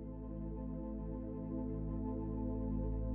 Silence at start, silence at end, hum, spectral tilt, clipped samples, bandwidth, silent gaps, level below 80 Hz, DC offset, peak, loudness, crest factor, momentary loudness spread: 0 s; 0 s; none; -13 dB/octave; under 0.1%; 2.6 kHz; none; -44 dBFS; under 0.1%; -28 dBFS; -42 LUFS; 12 dB; 5 LU